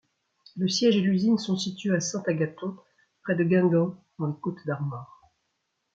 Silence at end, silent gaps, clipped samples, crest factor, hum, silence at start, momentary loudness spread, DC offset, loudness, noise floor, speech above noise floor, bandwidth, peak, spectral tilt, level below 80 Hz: 0.9 s; none; under 0.1%; 16 dB; none; 0.55 s; 14 LU; under 0.1%; -26 LUFS; -78 dBFS; 52 dB; 7.8 kHz; -10 dBFS; -5.5 dB/octave; -70 dBFS